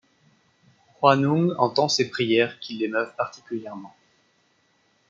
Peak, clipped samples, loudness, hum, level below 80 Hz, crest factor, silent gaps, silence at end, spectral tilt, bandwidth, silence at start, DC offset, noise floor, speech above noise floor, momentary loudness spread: -2 dBFS; under 0.1%; -23 LUFS; none; -72 dBFS; 24 dB; none; 1.2 s; -5 dB/octave; 7.6 kHz; 1 s; under 0.1%; -65 dBFS; 42 dB; 14 LU